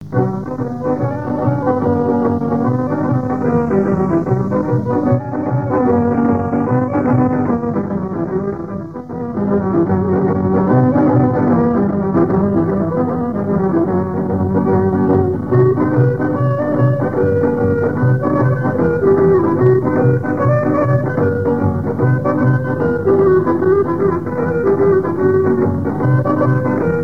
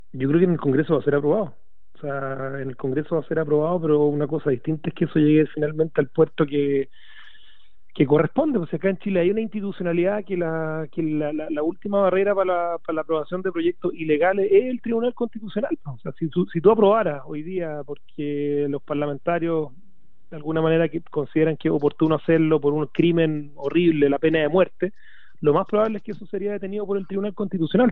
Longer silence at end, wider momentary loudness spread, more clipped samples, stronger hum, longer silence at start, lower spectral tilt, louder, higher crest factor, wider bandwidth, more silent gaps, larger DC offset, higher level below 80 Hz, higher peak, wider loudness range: about the same, 0 s vs 0 s; second, 6 LU vs 10 LU; neither; neither; second, 0 s vs 0.15 s; about the same, -11.5 dB/octave vs -10.5 dB/octave; first, -15 LUFS vs -22 LUFS; about the same, 14 dB vs 18 dB; second, 3 kHz vs 4.1 kHz; neither; about the same, 0.9% vs 1%; first, -42 dBFS vs -62 dBFS; first, 0 dBFS vs -4 dBFS; about the same, 3 LU vs 3 LU